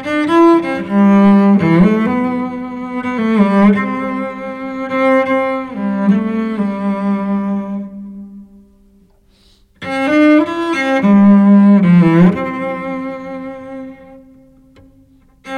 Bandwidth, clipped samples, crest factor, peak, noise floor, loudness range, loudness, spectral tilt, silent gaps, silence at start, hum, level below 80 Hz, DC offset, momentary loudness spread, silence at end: 8.8 kHz; under 0.1%; 12 dB; -2 dBFS; -50 dBFS; 10 LU; -13 LUFS; -8.5 dB/octave; none; 0 s; none; -46 dBFS; under 0.1%; 17 LU; 0 s